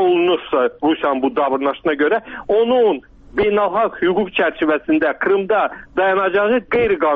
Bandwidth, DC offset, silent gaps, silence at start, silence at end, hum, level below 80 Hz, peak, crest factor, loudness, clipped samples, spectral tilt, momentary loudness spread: 4.7 kHz; under 0.1%; none; 0 s; 0 s; none; -48 dBFS; -6 dBFS; 10 dB; -17 LUFS; under 0.1%; -3 dB/octave; 4 LU